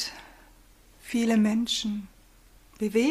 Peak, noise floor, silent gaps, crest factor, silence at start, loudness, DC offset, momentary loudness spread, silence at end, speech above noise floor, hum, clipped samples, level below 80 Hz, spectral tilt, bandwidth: -14 dBFS; -56 dBFS; none; 16 dB; 0 s; -27 LUFS; under 0.1%; 24 LU; 0 s; 31 dB; none; under 0.1%; -58 dBFS; -4.5 dB/octave; 15 kHz